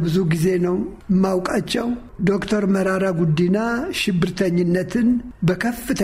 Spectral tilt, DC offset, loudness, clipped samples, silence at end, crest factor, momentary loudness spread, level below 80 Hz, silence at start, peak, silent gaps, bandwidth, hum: -6.5 dB/octave; under 0.1%; -20 LUFS; under 0.1%; 0 s; 14 dB; 4 LU; -44 dBFS; 0 s; -4 dBFS; none; 16 kHz; none